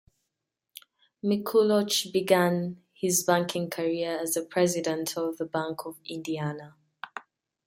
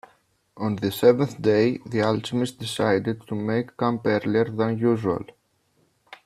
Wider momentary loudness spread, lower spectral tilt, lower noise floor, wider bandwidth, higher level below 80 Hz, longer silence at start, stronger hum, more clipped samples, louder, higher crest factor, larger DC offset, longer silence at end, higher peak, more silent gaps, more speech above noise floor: first, 14 LU vs 9 LU; second, -4 dB/octave vs -6.5 dB/octave; first, -85 dBFS vs -66 dBFS; about the same, 16.5 kHz vs 15.5 kHz; second, -72 dBFS vs -62 dBFS; first, 1.25 s vs 0.55 s; neither; neither; second, -27 LUFS vs -24 LUFS; about the same, 20 dB vs 18 dB; neither; first, 0.45 s vs 0.1 s; about the same, -8 dBFS vs -6 dBFS; neither; first, 58 dB vs 44 dB